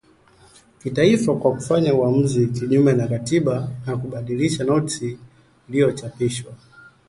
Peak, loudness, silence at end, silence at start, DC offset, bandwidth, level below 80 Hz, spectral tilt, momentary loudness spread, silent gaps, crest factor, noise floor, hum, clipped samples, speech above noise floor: -2 dBFS; -20 LUFS; 0.5 s; 0.85 s; under 0.1%; 11.5 kHz; -54 dBFS; -6.5 dB/octave; 11 LU; none; 18 dB; -53 dBFS; none; under 0.1%; 33 dB